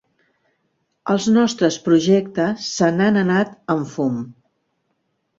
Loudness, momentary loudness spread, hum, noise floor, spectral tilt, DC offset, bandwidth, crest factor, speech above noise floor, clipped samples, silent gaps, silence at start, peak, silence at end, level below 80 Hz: -18 LUFS; 8 LU; none; -71 dBFS; -5.5 dB/octave; under 0.1%; 7.8 kHz; 16 dB; 53 dB; under 0.1%; none; 1.05 s; -4 dBFS; 1.05 s; -60 dBFS